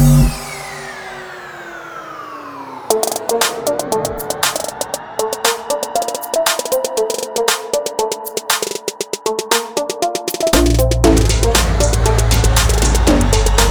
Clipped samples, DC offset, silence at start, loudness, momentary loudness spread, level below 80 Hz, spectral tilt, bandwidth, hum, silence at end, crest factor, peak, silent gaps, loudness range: under 0.1%; under 0.1%; 0 s; -16 LUFS; 16 LU; -20 dBFS; -4 dB/octave; over 20 kHz; none; 0 s; 16 dB; 0 dBFS; none; 7 LU